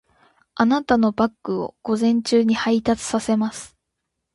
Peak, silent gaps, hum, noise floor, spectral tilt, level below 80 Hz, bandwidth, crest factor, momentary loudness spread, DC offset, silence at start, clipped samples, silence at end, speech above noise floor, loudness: -4 dBFS; none; none; -79 dBFS; -5 dB/octave; -54 dBFS; 11.5 kHz; 18 dB; 9 LU; under 0.1%; 0.55 s; under 0.1%; 0.65 s; 59 dB; -21 LUFS